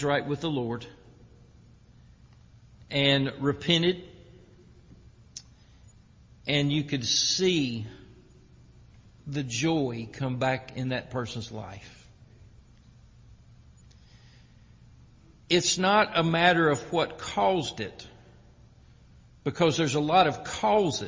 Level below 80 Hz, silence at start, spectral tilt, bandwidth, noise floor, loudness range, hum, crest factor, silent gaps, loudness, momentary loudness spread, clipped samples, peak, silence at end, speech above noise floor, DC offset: -56 dBFS; 0 s; -4 dB/octave; 7.8 kHz; -55 dBFS; 9 LU; none; 22 dB; none; -26 LUFS; 16 LU; under 0.1%; -6 dBFS; 0 s; 29 dB; under 0.1%